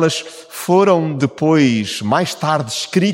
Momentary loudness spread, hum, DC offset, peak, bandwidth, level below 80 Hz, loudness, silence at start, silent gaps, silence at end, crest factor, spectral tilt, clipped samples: 8 LU; none; under 0.1%; -2 dBFS; 17 kHz; -60 dBFS; -16 LUFS; 0 s; none; 0 s; 14 dB; -5 dB/octave; under 0.1%